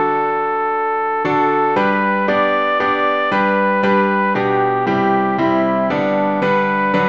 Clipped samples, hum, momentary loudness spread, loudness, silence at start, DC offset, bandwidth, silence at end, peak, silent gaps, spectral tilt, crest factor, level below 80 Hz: under 0.1%; none; 3 LU; -16 LUFS; 0 s; 0.3%; 7 kHz; 0 s; -2 dBFS; none; -7.5 dB/octave; 14 dB; -58 dBFS